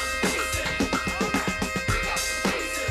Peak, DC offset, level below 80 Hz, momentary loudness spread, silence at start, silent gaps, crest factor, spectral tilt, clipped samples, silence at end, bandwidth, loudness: -10 dBFS; under 0.1%; -38 dBFS; 2 LU; 0 s; none; 16 dB; -3 dB/octave; under 0.1%; 0 s; 15.5 kHz; -25 LUFS